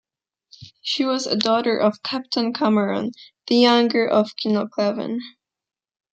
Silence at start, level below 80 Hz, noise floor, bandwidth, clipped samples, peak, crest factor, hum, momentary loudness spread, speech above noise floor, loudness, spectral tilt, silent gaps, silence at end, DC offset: 0.6 s; -70 dBFS; -89 dBFS; 8.4 kHz; under 0.1%; -2 dBFS; 20 dB; none; 13 LU; 69 dB; -20 LUFS; -5 dB/octave; none; 0.85 s; under 0.1%